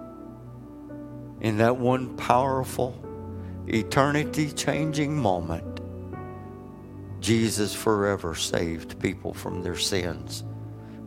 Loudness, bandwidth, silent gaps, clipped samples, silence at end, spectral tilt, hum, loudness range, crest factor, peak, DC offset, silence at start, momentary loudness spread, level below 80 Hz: -26 LUFS; 16.5 kHz; none; under 0.1%; 0 s; -5 dB/octave; none; 3 LU; 24 dB; -2 dBFS; under 0.1%; 0 s; 18 LU; -50 dBFS